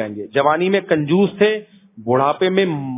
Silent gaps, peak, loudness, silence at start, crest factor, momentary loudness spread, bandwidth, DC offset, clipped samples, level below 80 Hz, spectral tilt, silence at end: none; 0 dBFS; -17 LUFS; 0 s; 16 dB; 5 LU; 3.9 kHz; under 0.1%; under 0.1%; -62 dBFS; -10.5 dB/octave; 0 s